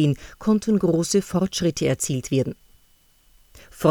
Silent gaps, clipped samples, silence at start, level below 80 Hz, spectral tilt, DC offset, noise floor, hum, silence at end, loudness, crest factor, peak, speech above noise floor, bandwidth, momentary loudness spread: none; under 0.1%; 0 s; -50 dBFS; -5.5 dB/octave; under 0.1%; -58 dBFS; none; 0 s; -23 LUFS; 18 dB; -4 dBFS; 36 dB; over 20 kHz; 5 LU